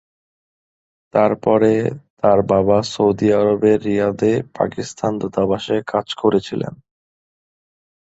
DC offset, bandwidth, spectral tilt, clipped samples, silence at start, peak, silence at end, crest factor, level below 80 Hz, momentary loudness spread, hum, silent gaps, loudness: under 0.1%; 8 kHz; -6.5 dB/octave; under 0.1%; 1.15 s; 0 dBFS; 1.35 s; 18 dB; -50 dBFS; 8 LU; none; 2.10-2.17 s; -18 LUFS